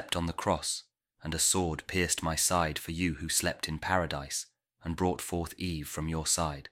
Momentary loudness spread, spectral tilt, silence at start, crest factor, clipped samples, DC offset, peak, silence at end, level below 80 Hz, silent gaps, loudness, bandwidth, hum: 10 LU; -3 dB/octave; 0 s; 22 dB; under 0.1%; under 0.1%; -10 dBFS; 0.05 s; -48 dBFS; none; -31 LUFS; 16.5 kHz; none